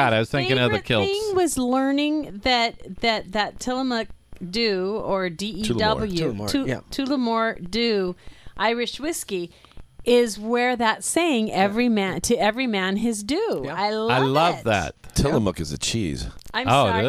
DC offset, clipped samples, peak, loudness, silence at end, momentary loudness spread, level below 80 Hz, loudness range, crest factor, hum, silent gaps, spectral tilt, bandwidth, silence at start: under 0.1%; under 0.1%; -6 dBFS; -23 LUFS; 0 s; 8 LU; -44 dBFS; 3 LU; 18 dB; none; none; -4.5 dB/octave; 15.5 kHz; 0 s